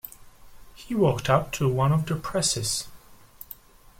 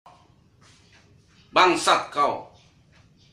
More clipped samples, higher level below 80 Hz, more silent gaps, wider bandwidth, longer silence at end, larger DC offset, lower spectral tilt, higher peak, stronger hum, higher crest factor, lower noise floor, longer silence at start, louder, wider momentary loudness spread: neither; first, -48 dBFS vs -64 dBFS; neither; about the same, 16.5 kHz vs 15 kHz; about the same, 0.85 s vs 0.9 s; neither; first, -4.5 dB/octave vs -2.5 dB/octave; second, -6 dBFS vs -2 dBFS; neither; about the same, 20 dB vs 24 dB; second, -48 dBFS vs -57 dBFS; second, 0.05 s vs 1.55 s; second, -25 LUFS vs -21 LUFS; first, 20 LU vs 7 LU